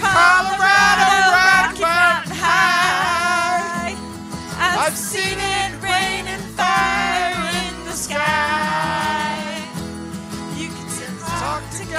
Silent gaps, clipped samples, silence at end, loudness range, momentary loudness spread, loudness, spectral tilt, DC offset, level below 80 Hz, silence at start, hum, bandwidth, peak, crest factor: none; under 0.1%; 0 s; 8 LU; 15 LU; -17 LUFS; -2.5 dB/octave; under 0.1%; -44 dBFS; 0 s; none; 16 kHz; -2 dBFS; 16 dB